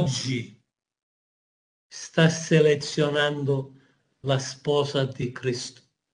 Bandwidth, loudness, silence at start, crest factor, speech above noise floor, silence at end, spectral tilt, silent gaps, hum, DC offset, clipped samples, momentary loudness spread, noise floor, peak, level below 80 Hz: 10 kHz; -25 LUFS; 0 s; 20 dB; 28 dB; 0.4 s; -5 dB/octave; 1.03-1.90 s; none; under 0.1%; under 0.1%; 17 LU; -52 dBFS; -6 dBFS; -64 dBFS